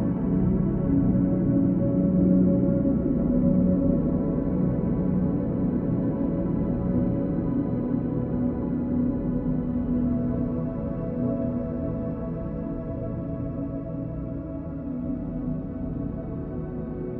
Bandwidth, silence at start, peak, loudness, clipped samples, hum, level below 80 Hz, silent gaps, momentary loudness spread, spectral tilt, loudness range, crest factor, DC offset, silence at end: 2.8 kHz; 0 s; -10 dBFS; -26 LUFS; under 0.1%; none; -38 dBFS; none; 10 LU; -14 dB/octave; 9 LU; 16 dB; under 0.1%; 0 s